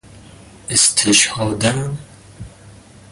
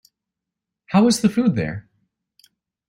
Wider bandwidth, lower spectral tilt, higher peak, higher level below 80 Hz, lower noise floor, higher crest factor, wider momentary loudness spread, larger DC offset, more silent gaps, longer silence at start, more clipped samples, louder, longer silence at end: second, 12 kHz vs 16 kHz; second, -2.5 dB/octave vs -5.5 dB/octave; first, 0 dBFS vs -4 dBFS; first, -46 dBFS vs -56 dBFS; second, -42 dBFS vs -84 dBFS; about the same, 20 dB vs 18 dB; first, 17 LU vs 12 LU; neither; neither; second, 0.1 s vs 0.9 s; neither; first, -14 LUFS vs -19 LUFS; second, 0.4 s vs 1.1 s